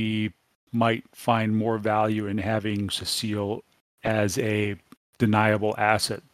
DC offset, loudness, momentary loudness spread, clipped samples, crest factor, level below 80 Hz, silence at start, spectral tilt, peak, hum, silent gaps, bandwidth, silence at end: under 0.1%; -25 LUFS; 9 LU; under 0.1%; 22 dB; -58 dBFS; 0 s; -5 dB/octave; -4 dBFS; none; 0.55-0.67 s, 3.81-3.98 s, 4.97-5.13 s; 15.5 kHz; 0.15 s